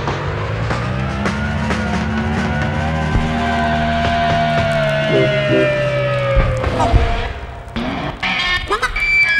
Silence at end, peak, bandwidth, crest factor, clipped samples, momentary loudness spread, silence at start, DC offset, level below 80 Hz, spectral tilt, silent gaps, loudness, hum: 0 s; 0 dBFS; 12.5 kHz; 16 dB; under 0.1%; 7 LU; 0 s; under 0.1%; -26 dBFS; -6 dB/octave; none; -17 LUFS; none